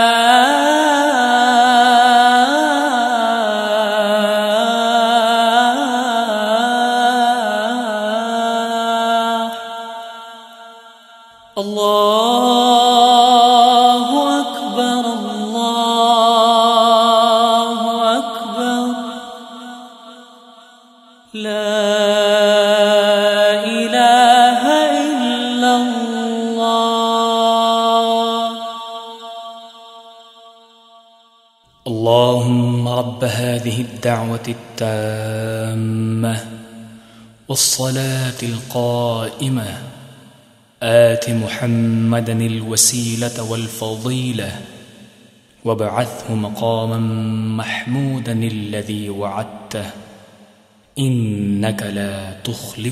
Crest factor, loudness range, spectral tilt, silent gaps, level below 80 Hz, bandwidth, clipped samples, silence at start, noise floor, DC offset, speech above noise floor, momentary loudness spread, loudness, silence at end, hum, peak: 16 dB; 10 LU; -4 dB/octave; none; -60 dBFS; 15.5 kHz; under 0.1%; 0 s; -53 dBFS; under 0.1%; 35 dB; 16 LU; -15 LUFS; 0 s; none; 0 dBFS